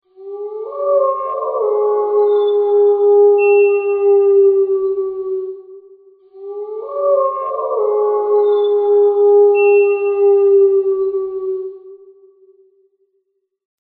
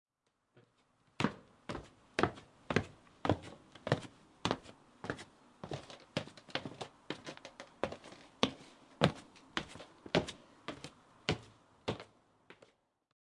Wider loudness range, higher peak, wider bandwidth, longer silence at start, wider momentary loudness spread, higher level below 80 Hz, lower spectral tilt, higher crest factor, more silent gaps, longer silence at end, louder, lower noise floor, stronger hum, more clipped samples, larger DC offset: about the same, 7 LU vs 6 LU; first, -4 dBFS vs -8 dBFS; second, 3.7 kHz vs 11.5 kHz; second, 0.2 s vs 1.2 s; about the same, 16 LU vs 17 LU; about the same, -66 dBFS vs -66 dBFS; second, -2.5 dB/octave vs -5 dB/octave; second, 12 dB vs 32 dB; neither; first, 1.85 s vs 0.75 s; first, -14 LUFS vs -40 LUFS; second, -68 dBFS vs -82 dBFS; neither; neither; neither